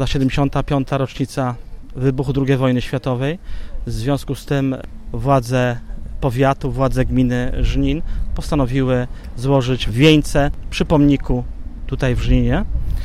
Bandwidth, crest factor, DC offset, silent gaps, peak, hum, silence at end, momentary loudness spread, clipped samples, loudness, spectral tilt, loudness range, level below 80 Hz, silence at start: 14 kHz; 18 dB; under 0.1%; none; 0 dBFS; none; 0 s; 14 LU; under 0.1%; -19 LUFS; -7 dB/octave; 4 LU; -26 dBFS; 0 s